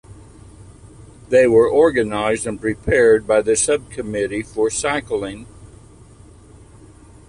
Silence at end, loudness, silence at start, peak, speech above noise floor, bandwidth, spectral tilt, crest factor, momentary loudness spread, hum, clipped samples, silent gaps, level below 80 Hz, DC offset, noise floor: 1.6 s; -17 LUFS; 0.1 s; -2 dBFS; 27 dB; 11.5 kHz; -4 dB/octave; 16 dB; 11 LU; none; under 0.1%; none; -44 dBFS; under 0.1%; -44 dBFS